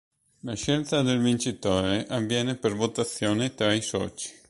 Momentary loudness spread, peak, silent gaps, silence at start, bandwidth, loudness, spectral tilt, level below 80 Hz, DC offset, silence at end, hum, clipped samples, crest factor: 7 LU; -8 dBFS; none; 0.45 s; 11.5 kHz; -26 LUFS; -4.5 dB/octave; -52 dBFS; under 0.1%; 0.15 s; none; under 0.1%; 18 dB